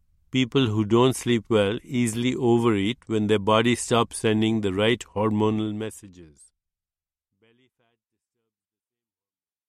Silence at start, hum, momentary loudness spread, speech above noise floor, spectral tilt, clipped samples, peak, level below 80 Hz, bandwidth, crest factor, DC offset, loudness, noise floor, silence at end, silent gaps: 0.35 s; none; 6 LU; over 67 dB; -5.5 dB/octave; under 0.1%; -6 dBFS; -58 dBFS; 13.5 kHz; 18 dB; under 0.1%; -23 LUFS; under -90 dBFS; 3.45 s; none